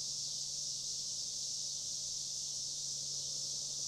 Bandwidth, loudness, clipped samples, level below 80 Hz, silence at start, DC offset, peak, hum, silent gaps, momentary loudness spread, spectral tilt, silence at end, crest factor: 16 kHz; -37 LUFS; under 0.1%; -72 dBFS; 0 s; under 0.1%; -28 dBFS; none; none; 1 LU; 0.5 dB/octave; 0 s; 12 dB